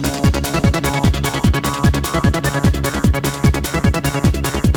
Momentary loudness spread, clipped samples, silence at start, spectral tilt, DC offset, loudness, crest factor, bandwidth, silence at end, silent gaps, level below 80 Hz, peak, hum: 1 LU; under 0.1%; 0 s; -5.5 dB/octave; 0.1%; -17 LUFS; 14 dB; over 20 kHz; 0 s; none; -22 dBFS; -2 dBFS; none